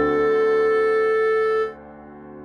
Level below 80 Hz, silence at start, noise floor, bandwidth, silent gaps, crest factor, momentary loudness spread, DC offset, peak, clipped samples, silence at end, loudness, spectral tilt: -54 dBFS; 0 s; -41 dBFS; 8.8 kHz; none; 10 dB; 5 LU; under 0.1%; -10 dBFS; under 0.1%; 0 s; -20 LUFS; -6 dB/octave